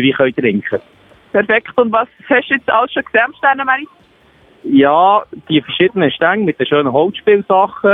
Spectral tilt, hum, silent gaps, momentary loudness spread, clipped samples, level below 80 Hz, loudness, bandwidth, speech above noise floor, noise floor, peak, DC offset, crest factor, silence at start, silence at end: -8.5 dB/octave; none; none; 6 LU; under 0.1%; -58 dBFS; -13 LUFS; 3.9 kHz; 35 dB; -48 dBFS; 0 dBFS; under 0.1%; 14 dB; 0 s; 0 s